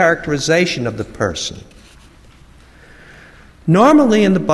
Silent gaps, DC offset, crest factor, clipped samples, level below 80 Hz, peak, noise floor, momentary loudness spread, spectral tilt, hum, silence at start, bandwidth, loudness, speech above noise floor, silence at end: none; under 0.1%; 16 dB; under 0.1%; -44 dBFS; 0 dBFS; -44 dBFS; 14 LU; -5.5 dB/octave; none; 0 s; 12.5 kHz; -15 LUFS; 30 dB; 0 s